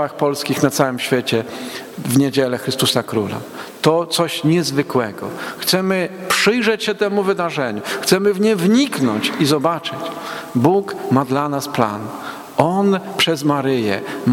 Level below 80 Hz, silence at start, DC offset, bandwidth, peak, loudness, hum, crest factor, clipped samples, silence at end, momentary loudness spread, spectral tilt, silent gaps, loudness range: -58 dBFS; 0 s; under 0.1%; 18 kHz; 0 dBFS; -18 LUFS; none; 18 dB; under 0.1%; 0 s; 10 LU; -4.5 dB/octave; none; 2 LU